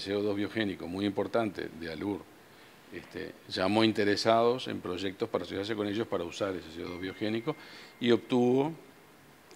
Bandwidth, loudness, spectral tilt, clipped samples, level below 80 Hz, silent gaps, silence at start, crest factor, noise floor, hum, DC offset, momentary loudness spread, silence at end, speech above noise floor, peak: 16 kHz; -31 LUFS; -5.5 dB/octave; under 0.1%; -68 dBFS; none; 0 s; 22 dB; -57 dBFS; none; under 0.1%; 15 LU; 0 s; 26 dB; -10 dBFS